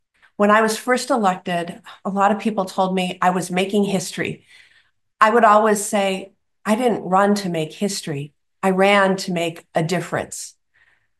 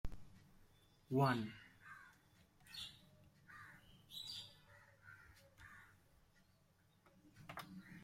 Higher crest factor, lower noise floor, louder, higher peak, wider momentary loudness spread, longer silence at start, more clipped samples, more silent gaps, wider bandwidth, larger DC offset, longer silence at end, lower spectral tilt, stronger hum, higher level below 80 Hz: second, 20 dB vs 26 dB; second, -60 dBFS vs -74 dBFS; first, -19 LUFS vs -45 LUFS; first, 0 dBFS vs -24 dBFS; second, 14 LU vs 27 LU; first, 0.4 s vs 0.05 s; neither; neither; second, 12.5 kHz vs 16 kHz; neither; first, 0.7 s vs 0 s; second, -4.5 dB/octave vs -6 dB/octave; neither; about the same, -66 dBFS vs -64 dBFS